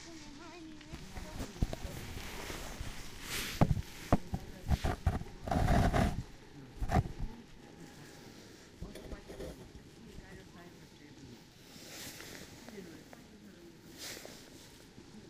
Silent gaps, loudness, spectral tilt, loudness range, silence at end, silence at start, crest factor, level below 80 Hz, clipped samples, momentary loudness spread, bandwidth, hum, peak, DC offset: none; -38 LUFS; -5.5 dB/octave; 16 LU; 0 s; 0 s; 26 dB; -44 dBFS; under 0.1%; 21 LU; 15.5 kHz; none; -12 dBFS; under 0.1%